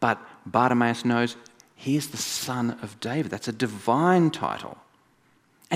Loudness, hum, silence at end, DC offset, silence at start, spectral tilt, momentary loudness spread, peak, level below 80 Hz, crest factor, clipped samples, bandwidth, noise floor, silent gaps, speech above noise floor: -25 LUFS; none; 0 s; under 0.1%; 0 s; -5 dB/octave; 12 LU; -6 dBFS; -68 dBFS; 20 dB; under 0.1%; 16 kHz; -63 dBFS; none; 38 dB